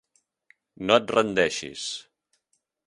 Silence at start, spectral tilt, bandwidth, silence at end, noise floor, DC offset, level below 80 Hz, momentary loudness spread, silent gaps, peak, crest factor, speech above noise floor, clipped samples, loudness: 0.8 s; -3.5 dB/octave; 11.5 kHz; 0.85 s; -75 dBFS; under 0.1%; -64 dBFS; 13 LU; none; -4 dBFS; 24 dB; 51 dB; under 0.1%; -24 LUFS